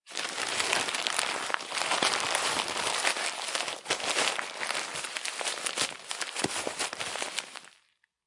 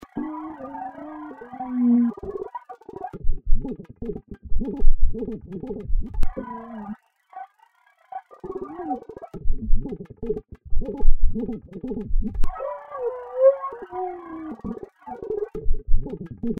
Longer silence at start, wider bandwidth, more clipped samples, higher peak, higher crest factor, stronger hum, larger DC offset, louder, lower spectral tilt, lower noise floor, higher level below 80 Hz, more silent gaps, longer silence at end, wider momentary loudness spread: about the same, 0.05 s vs 0.15 s; first, 11.5 kHz vs 2.1 kHz; neither; about the same, -4 dBFS vs -2 dBFS; first, 28 dB vs 18 dB; neither; neither; about the same, -30 LUFS vs -29 LUFS; second, 0 dB/octave vs -10.5 dB/octave; first, -69 dBFS vs -60 dBFS; second, -74 dBFS vs -24 dBFS; neither; first, 0.55 s vs 0.05 s; second, 7 LU vs 15 LU